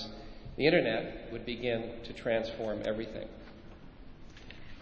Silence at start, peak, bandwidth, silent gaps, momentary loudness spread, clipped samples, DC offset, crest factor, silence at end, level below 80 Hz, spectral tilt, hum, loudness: 0 s; -12 dBFS; 8 kHz; none; 26 LU; under 0.1%; under 0.1%; 24 dB; 0 s; -52 dBFS; -6.5 dB/octave; none; -33 LUFS